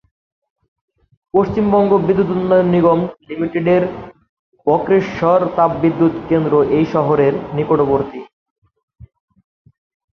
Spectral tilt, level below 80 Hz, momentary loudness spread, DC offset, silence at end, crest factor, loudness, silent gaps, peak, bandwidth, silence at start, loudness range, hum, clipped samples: -9.5 dB/octave; -46 dBFS; 8 LU; under 0.1%; 1.95 s; 16 dB; -15 LUFS; 4.29-4.52 s; -2 dBFS; 6.4 kHz; 1.35 s; 3 LU; none; under 0.1%